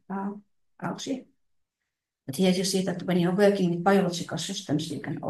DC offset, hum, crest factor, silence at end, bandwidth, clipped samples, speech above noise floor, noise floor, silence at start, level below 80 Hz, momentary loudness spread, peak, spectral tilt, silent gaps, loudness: under 0.1%; none; 18 dB; 0 s; 12.5 kHz; under 0.1%; 60 dB; -85 dBFS; 0.1 s; -70 dBFS; 15 LU; -8 dBFS; -5.5 dB/octave; none; -26 LUFS